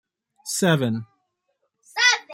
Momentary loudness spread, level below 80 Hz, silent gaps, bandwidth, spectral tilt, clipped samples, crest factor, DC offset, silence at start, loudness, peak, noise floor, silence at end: 15 LU; -68 dBFS; none; 16 kHz; -3.5 dB/octave; under 0.1%; 20 dB; under 0.1%; 0.45 s; -21 LUFS; -4 dBFS; -74 dBFS; 0 s